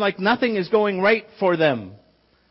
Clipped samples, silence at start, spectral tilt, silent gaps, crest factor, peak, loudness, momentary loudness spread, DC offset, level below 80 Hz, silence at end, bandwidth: under 0.1%; 0 s; -9.5 dB/octave; none; 16 dB; -6 dBFS; -20 LUFS; 3 LU; under 0.1%; -64 dBFS; 0.55 s; 5.8 kHz